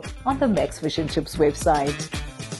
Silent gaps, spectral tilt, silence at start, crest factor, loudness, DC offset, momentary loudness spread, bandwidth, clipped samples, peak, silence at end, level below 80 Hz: none; -5 dB/octave; 0 s; 16 dB; -24 LUFS; under 0.1%; 9 LU; 12.5 kHz; under 0.1%; -8 dBFS; 0 s; -38 dBFS